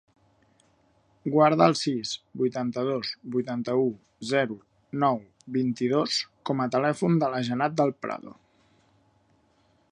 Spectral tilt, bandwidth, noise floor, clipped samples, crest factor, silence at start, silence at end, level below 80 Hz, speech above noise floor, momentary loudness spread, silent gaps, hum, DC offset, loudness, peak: -5.5 dB/octave; 10.5 kHz; -65 dBFS; under 0.1%; 22 dB; 1.25 s; 1.6 s; -72 dBFS; 40 dB; 12 LU; none; none; under 0.1%; -26 LUFS; -4 dBFS